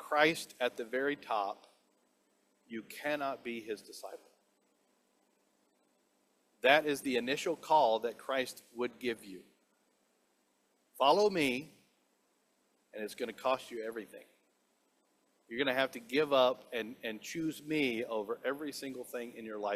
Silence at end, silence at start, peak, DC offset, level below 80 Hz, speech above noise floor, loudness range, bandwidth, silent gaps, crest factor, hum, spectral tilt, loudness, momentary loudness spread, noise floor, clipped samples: 0 s; 0 s; -10 dBFS; under 0.1%; -80 dBFS; 41 dB; 10 LU; 15.5 kHz; none; 26 dB; none; -3.5 dB/octave; -34 LUFS; 16 LU; -75 dBFS; under 0.1%